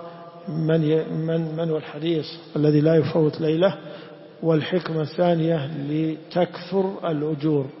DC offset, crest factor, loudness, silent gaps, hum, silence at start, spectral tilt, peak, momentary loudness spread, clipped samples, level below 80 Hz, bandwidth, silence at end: under 0.1%; 16 dB; -23 LUFS; none; none; 0 s; -11.5 dB/octave; -6 dBFS; 10 LU; under 0.1%; -66 dBFS; 5.8 kHz; 0 s